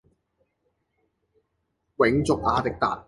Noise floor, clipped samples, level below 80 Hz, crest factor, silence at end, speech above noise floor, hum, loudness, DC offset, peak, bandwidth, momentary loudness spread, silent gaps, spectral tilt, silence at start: -76 dBFS; under 0.1%; -48 dBFS; 20 dB; 0.05 s; 53 dB; none; -23 LUFS; under 0.1%; -6 dBFS; 11.5 kHz; 3 LU; none; -6 dB/octave; 2 s